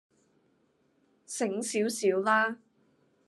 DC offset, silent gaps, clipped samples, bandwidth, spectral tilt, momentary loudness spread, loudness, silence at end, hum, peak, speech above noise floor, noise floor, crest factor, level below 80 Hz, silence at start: under 0.1%; none; under 0.1%; 12.5 kHz; -3.5 dB/octave; 12 LU; -29 LUFS; 0.7 s; none; -12 dBFS; 42 dB; -70 dBFS; 20 dB; -86 dBFS; 1.3 s